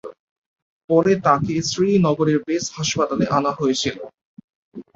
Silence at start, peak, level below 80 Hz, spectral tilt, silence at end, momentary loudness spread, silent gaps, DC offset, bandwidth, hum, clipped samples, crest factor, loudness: 0.05 s; -2 dBFS; -54 dBFS; -5 dB/octave; 0.15 s; 8 LU; 0.19-0.56 s, 0.62-0.88 s, 4.21-4.37 s, 4.44-4.48 s, 4.55-4.72 s; under 0.1%; 7.8 kHz; none; under 0.1%; 18 dB; -19 LUFS